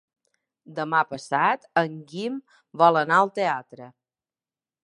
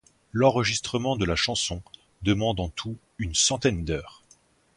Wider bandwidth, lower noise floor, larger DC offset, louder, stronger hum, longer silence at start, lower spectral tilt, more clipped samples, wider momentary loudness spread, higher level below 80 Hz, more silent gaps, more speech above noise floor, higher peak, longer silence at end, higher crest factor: about the same, 11 kHz vs 11.5 kHz; first, under -90 dBFS vs -60 dBFS; neither; about the same, -23 LUFS vs -25 LUFS; neither; first, 0.7 s vs 0.35 s; first, -5.5 dB/octave vs -3.5 dB/octave; neither; about the same, 13 LU vs 12 LU; second, -76 dBFS vs -44 dBFS; neither; first, over 66 dB vs 35 dB; about the same, -4 dBFS vs -6 dBFS; first, 0.95 s vs 0.65 s; about the same, 22 dB vs 20 dB